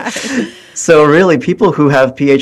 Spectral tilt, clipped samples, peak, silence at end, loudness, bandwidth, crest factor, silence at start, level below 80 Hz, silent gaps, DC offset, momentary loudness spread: -5.5 dB/octave; 0.4%; 0 dBFS; 0 s; -10 LUFS; 12.5 kHz; 10 dB; 0 s; -48 dBFS; none; under 0.1%; 12 LU